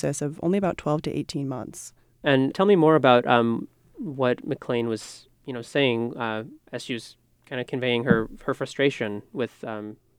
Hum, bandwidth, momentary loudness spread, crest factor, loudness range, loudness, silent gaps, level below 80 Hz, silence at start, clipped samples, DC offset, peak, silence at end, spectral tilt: none; 14.5 kHz; 18 LU; 22 dB; 7 LU; -24 LUFS; none; -56 dBFS; 0.05 s; under 0.1%; under 0.1%; -4 dBFS; 0.25 s; -6 dB/octave